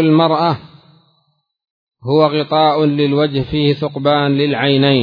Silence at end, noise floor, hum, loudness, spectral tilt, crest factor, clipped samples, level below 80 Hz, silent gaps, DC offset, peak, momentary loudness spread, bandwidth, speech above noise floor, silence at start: 0 s; -64 dBFS; none; -14 LUFS; -9 dB/octave; 14 dB; under 0.1%; -48 dBFS; 1.70-1.87 s; under 0.1%; 0 dBFS; 5 LU; 5.2 kHz; 50 dB; 0 s